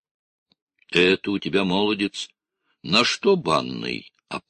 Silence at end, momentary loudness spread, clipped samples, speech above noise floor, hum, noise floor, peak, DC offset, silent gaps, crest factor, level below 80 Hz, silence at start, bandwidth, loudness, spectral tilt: 0.1 s; 15 LU; under 0.1%; 52 dB; none; -74 dBFS; -4 dBFS; under 0.1%; none; 20 dB; -58 dBFS; 0.9 s; 10 kHz; -21 LUFS; -4.5 dB/octave